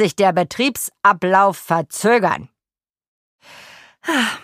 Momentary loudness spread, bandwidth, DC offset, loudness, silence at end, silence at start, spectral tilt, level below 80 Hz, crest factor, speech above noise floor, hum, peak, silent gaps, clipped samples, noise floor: 7 LU; 15.5 kHz; under 0.1%; -17 LUFS; 0.05 s; 0 s; -4 dB/octave; -62 dBFS; 18 dB; over 73 dB; none; 0 dBFS; 3.08-3.39 s; under 0.1%; under -90 dBFS